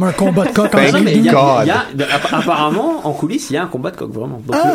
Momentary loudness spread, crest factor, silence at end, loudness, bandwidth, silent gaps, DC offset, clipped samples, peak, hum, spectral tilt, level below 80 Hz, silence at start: 12 LU; 14 dB; 0 s; -14 LUFS; 16.5 kHz; none; under 0.1%; under 0.1%; 0 dBFS; none; -5.5 dB/octave; -48 dBFS; 0 s